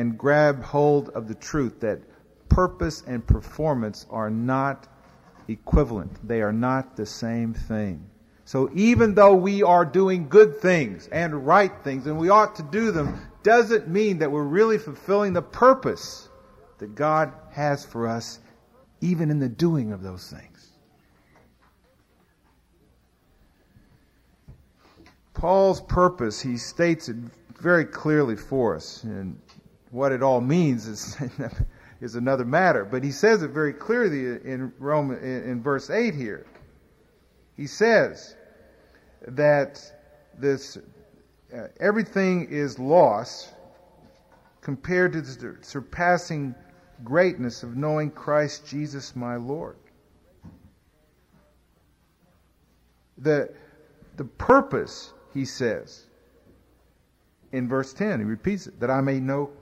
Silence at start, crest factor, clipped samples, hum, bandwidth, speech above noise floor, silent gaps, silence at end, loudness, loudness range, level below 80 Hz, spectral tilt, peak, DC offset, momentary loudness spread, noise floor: 0 s; 20 dB; under 0.1%; none; 14 kHz; 41 dB; none; 0.1 s; -23 LUFS; 10 LU; -42 dBFS; -6.5 dB/octave; -4 dBFS; under 0.1%; 17 LU; -64 dBFS